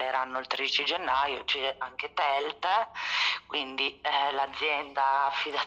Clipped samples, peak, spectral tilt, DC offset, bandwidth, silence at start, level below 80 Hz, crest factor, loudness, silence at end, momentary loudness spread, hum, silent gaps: under 0.1%; -14 dBFS; -1 dB/octave; under 0.1%; 8.6 kHz; 0 s; -66 dBFS; 16 dB; -28 LUFS; 0 s; 5 LU; none; none